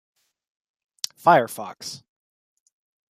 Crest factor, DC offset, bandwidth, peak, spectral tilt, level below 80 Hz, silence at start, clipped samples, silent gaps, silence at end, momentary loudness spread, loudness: 24 dB; under 0.1%; 15.5 kHz; -2 dBFS; -4 dB/octave; -76 dBFS; 1.25 s; under 0.1%; none; 1.15 s; 18 LU; -22 LUFS